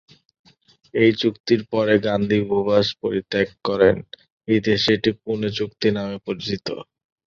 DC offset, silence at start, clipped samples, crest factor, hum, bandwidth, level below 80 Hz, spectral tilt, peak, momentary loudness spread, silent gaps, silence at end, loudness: under 0.1%; 0.95 s; under 0.1%; 20 dB; none; 7.2 kHz; -52 dBFS; -6 dB/octave; -2 dBFS; 10 LU; 1.40-1.44 s, 4.32-4.38 s; 0.5 s; -21 LUFS